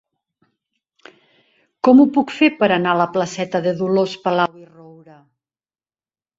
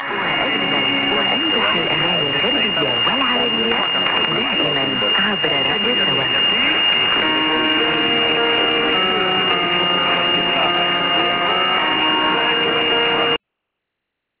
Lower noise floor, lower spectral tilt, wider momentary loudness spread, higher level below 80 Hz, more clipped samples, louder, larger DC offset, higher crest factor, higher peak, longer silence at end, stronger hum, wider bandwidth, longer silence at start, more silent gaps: first, under -90 dBFS vs -79 dBFS; about the same, -6 dB/octave vs -7 dB/octave; first, 9 LU vs 2 LU; second, -64 dBFS vs -50 dBFS; neither; about the same, -17 LUFS vs -15 LUFS; neither; about the same, 18 dB vs 14 dB; about the same, -2 dBFS vs -4 dBFS; first, 1.75 s vs 1.05 s; neither; first, 7.8 kHz vs 4 kHz; first, 1.85 s vs 0 s; neither